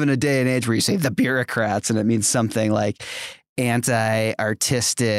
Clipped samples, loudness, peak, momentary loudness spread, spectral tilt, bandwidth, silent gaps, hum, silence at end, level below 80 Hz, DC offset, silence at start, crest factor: under 0.1%; -21 LUFS; -6 dBFS; 6 LU; -4.5 dB/octave; 16 kHz; 3.49-3.56 s; none; 0 s; -58 dBFS; under 0.1%; 0 s; 14 dB